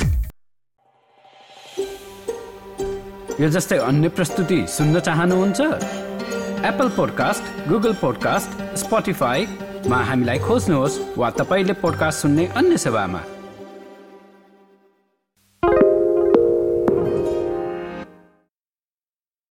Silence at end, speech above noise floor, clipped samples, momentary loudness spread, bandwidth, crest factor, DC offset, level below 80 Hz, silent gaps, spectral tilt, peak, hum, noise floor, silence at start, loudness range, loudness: 1.4 s; over 71 dB; under 0.1%; 14 LU; 17 kHz; 20 dB; under 0.1%; -40 dBFS; none; -5.5 dB/octave; -2 dBFS; none; under -90 dBFS; 0 s; 5 LU; -20 LUFS